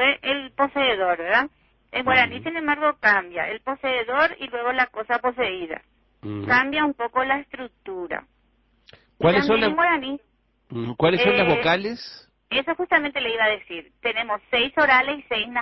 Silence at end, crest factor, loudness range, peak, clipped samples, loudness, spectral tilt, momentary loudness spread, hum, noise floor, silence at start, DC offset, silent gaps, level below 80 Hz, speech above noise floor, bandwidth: 0 s; 18 dB; 4 LU; -6 dBFS; under 0.1%; -22 LUFS; -6 dB/octave; 15 LU; none; -64 dBFS; 0 s; under 0.1%; none; -56 dBFS; 41 dB; 6 kHz